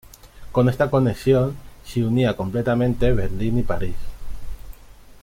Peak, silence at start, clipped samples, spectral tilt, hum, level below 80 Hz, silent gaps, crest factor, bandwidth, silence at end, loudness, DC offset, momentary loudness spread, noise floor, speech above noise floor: -6 dBFS; 0.25 s; under 0.1%; -8 dB/octave; none; -34 dBFS; none; 16 dB; 16 kHz; 0 s; -21 LUFS; under 0.1%; 20 LU; -44 dBFS; 25 dB